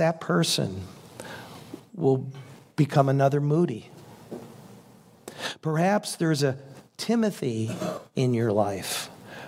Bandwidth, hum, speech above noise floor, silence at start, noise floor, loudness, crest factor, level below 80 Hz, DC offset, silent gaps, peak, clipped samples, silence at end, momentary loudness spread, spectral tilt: 16 kHz; none; 28 dB; 0 s; -52 dBFS; -26 LUFS; 20 dB; -70 dBFS; under 0.1%; none; -8 dBFS; under 0.1%; 0 s; 20 LU; -5.5 dB/octave